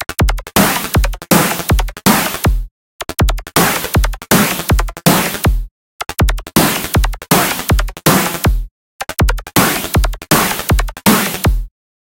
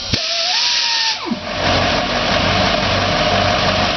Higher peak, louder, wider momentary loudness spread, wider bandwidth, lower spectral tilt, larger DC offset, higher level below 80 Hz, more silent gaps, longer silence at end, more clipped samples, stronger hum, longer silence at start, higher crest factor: first, 0 dBFS vs -4 dBFS; about the same, -14 LUFS vs -15 LUFS; first, 11 LU vs 4 LU; first, 17.5 kHz vs 6.6 kHz; about the same, -4 dB/octave vs -3.5 dB/octave; neither; first, -20 dBFS vs -34 dBFS; first, 2.71-2.99 s, 5.71-5.99 s, 8.71-8.99 s vs none; first, 0.3 s vs 0 s; neither; neither; about the same, 0 s vs 0 s; about the same, 14 dB vs 12 dB